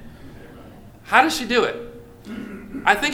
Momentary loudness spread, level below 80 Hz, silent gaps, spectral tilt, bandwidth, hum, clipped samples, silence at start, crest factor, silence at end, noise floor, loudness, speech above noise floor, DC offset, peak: 25 LU; -48 dBFS; none; -3 dB/octave; 19 kHz; none; under 0.1%; 0 s; 24 dB; 0 s; -43 dBFS; -19 LUFS; 24 dB; under 0.1%; 0 dBFS